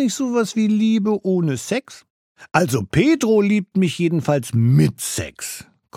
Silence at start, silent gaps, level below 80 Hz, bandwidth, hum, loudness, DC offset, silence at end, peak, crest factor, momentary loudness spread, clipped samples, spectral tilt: 0 s; 2.10-2.35 s; -50 dBFS; 16.5 kHz; none; -19 LUFS; under 0.1%; 0 s; 0 dBFS; 18 dB; 9 LU; under 0.1%; -6 dB/octave